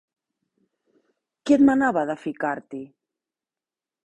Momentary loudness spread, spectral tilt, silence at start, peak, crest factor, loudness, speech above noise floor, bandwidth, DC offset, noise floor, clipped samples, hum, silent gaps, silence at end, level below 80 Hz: 19 LU; -6 dB/octave; 1.45 s; -6 dBFS; 20 dB; -22 LUFS; over 69 dB; 8.4 kHz; under 0.1%; under -90 dBFS; under 0.1%; none; none; 1.2 s; -64 dBFS